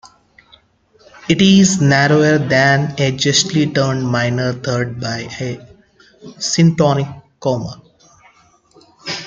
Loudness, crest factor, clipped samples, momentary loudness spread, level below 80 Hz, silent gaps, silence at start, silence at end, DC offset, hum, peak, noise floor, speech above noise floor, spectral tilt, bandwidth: -15 LUFS; 16 dB; under 0.1%; 15 LU; -50 dBFS; none; 0.05 s; 0 s; under 0.1%; none; 0 dBFS; -53 dBFS; 39 dB; -4.5 dB/octave; 9.4 kHz